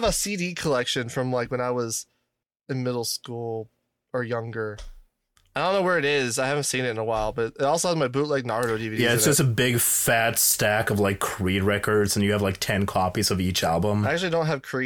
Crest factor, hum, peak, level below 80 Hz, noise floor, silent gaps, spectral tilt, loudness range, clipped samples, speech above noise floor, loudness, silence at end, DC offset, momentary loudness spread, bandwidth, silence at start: 16 dB; none; -8 dBFS; -48 dBFS; -80 dBFS; none; -4 dB/octave; 9 LU; under 0.1%; 56 dB; -24 LUFS; 0 s; under 0.1%; 11 LU; 18 kHz; 0 s